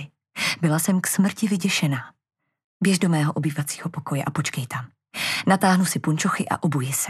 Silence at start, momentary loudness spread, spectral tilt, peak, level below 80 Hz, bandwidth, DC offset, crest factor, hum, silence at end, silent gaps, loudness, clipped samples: 0 s; 10 LU; -4.5 dB/octave; -6 dBFS; -68 dBFS; 14.5 kHz; under 0.1%; 18 dB; none; 0 s; 2.64-2.80 s; -23 LUFS; under 0.1%